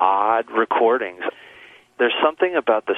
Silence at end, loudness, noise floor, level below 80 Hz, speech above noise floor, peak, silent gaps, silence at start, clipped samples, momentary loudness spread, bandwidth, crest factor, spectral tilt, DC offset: 0 s; -20 LUFS; -47 dBFS; -68 dBFS; 27 dB; -2 dBFS; none; 0 s; under 0.1%; 9 LU; 3.9 kHz; 18 dB; -5.5 dB/octave; under 0.1%